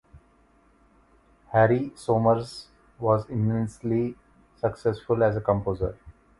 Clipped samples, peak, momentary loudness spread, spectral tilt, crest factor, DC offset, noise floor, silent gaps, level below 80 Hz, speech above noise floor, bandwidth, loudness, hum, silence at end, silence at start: under 0.1%; -6 dBFS; 9 LU; -8 dB/octave; 20 dB; under 0.1%; -61 dBFS; none; -50 dBFS; 36 dB; 11.5 kHz; -25 LUFS; none; 0.3 s; 1.5 s